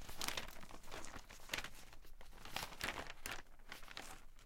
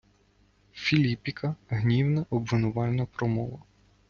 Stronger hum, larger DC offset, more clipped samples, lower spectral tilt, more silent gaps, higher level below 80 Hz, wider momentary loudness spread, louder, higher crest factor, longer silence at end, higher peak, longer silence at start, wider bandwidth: second, none vs 50 Hz at -50 dBFS; neither; neither; second, -1.5 dB/octave vs -7.5 dB/octave; neither; about the same, -56 dBFS vs -54 dBFS; first, 14 LU vs 8 LU; second, -48 LUFS vs -28 LUFS; first, 26 dB vs 18 dB; second, 0 s vs 0.5 s; second, -22 dBFS vs -10 dBFS; second, 0 s vs 0.75 s; first, 16.5 kHz vs 7 kHz